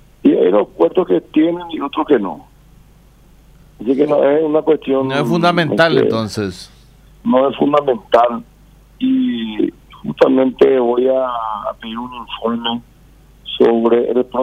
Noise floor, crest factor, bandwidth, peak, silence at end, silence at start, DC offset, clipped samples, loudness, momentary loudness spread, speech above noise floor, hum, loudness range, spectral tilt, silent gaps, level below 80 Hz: -46 dBFS; 14 dB; 13 kHz; 0 dBFS; 0 s; 0.25 s; under 0.1%; under 0.1%; -15 LUFS; 14 LU; 31 dB; none; 3 LU; -6.5 dB/octave; none; -48 dBFS